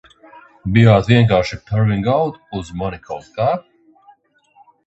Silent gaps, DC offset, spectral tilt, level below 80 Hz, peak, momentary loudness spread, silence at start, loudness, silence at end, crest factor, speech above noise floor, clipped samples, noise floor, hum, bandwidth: none; under 0.1%; -8 dB/octave; -40 dBFS; 0 dBFS; 17 LU; 0.65 s; -16 LUFS; 1.25 s; 18 dB; 38 dB; under 0.1%; -54 dBFS; none; 8 kHz